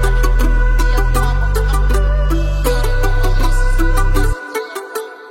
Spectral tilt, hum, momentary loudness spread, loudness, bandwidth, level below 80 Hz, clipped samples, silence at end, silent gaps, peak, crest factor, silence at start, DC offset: -5.5 dB/octave; none; 8 LU; -17 LUFS; 15.5 kHz; -14 dBFS; under 0.1%; 0 s; none; -2 dBFS; 10 dB; 0 s; under 0.1%